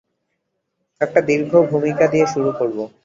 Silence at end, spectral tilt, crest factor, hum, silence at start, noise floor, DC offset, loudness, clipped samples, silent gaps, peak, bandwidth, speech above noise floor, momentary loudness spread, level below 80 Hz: 0.2 s; -6.5 dB/octave; 16 dB; none; 1 s; -74 dBFS; under 0.1%; -17 LUFS; under 0.1%; none; -2 dBFS; 7.6 kHz; 57 dB; 7 LU; -60 dBFS